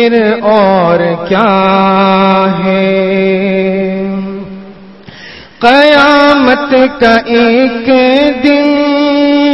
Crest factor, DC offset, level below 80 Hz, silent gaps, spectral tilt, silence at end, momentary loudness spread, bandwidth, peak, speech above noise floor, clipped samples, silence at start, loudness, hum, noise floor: 8 dB; 0.6%; -42 dBFS; none; -7 dB/octave; 0 s; 10 LU; 8.2 kHz; 0 dBFS; 25 dB; 0.5%; 0 s; -8 LUFS; none; -32 dBFS